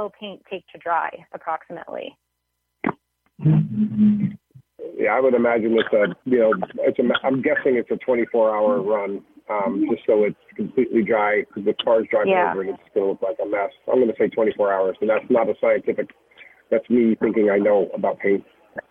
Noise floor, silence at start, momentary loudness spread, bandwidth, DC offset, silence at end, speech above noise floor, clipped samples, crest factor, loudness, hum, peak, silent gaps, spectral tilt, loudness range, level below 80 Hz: -76 dBFS; 0 s; 13 LU; 3.9 kHz; under 0.1%; 0.1 s; 56 dB; under 0.1%; 14 dB; -21 LUFS; none; -6 dBFS; none; -9.5 dB/octave; 4 LU; -62 dBFS